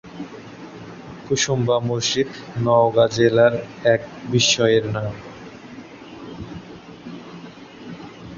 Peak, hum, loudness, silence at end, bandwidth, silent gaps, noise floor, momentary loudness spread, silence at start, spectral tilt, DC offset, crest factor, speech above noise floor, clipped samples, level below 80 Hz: -4 dBFS; none; -19 LUFS; 0 s; 7.6 kHz; none; -39 dBFS; 23 LU; 0.05 s; -4 dB/octave; under 0.1%; 18 dB; 21 dB; under 0.1%; -52 dBFS